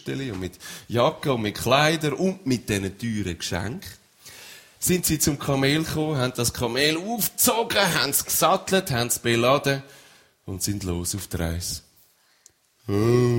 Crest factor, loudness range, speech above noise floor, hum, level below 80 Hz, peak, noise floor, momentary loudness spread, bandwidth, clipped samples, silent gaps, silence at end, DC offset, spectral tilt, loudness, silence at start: 20 dB; 6 LU; 36 dB; none; -48 dBFS; -4 dBFS; -60 dBFS; 14 LU; 16.5 kHz; under 0.1%; none; 0 s; under 0.1%; -4 dB/octave; -23 LUFS; 0.05 s